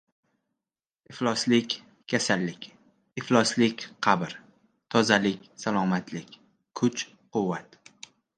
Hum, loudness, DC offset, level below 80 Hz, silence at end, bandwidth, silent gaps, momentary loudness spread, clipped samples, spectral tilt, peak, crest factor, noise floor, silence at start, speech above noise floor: none; -27 LUFS; under 0.1%; -70 dBFS; 0.75 s; 9.8 kHz; none; 19 LU; under 0.1%; -4.5 dB/octave; -4 dBFS; 24 dB; under -90 dBFS; 1.1 s; over 64 dB